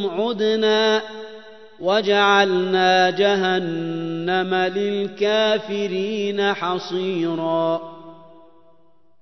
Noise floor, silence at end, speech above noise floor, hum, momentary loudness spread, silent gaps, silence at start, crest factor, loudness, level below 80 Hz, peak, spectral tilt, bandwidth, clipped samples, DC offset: -60 dBFS; 1.05 s; 41 dB; none; 10 LU; none; 0 s; 20 dB; -20 LUFS; -68 dBFS; -2 dBFS; -5 dB/octave; 6.2 kHz; under 0.1%; 0.3%